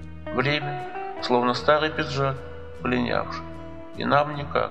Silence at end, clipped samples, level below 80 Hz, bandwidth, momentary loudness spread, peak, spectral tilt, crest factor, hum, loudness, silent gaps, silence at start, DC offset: 0 s; under 0.1%; -48 dBFS; 8.8 kHz; 14 LU; -4 dBFS; -6 dB/octave; 22 dB; none; -25 LUFS; none; 0 s; 0.8%